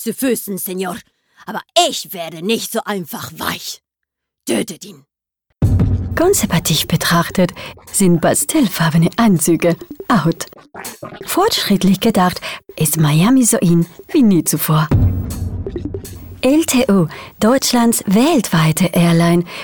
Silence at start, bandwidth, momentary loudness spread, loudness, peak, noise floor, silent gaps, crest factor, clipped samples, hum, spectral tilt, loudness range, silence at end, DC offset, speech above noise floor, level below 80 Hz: 0 s; over 20 kHz; 14 LU; -15 LUFS; 0 dBFS; -79 dBFS; none; 16 dB; under 0.1%; none; -5 dB/octave; 7 LU; 0 s; under 0.1%; 64 dB; -34 dBFS